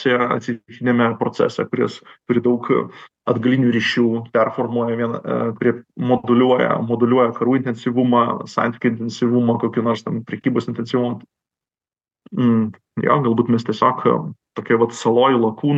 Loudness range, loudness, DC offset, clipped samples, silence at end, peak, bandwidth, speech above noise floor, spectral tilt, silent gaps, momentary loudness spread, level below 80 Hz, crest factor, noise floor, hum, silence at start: 4 LU; -19 LUFS; under 0.1%; under 0.1%; 0 s; -2 dBFS; 8 kHz; over 72 dB; -7 dB/octave; none; 8 LU; -68 dBFS; 18 dB; under -90 dBFS; none; 0 s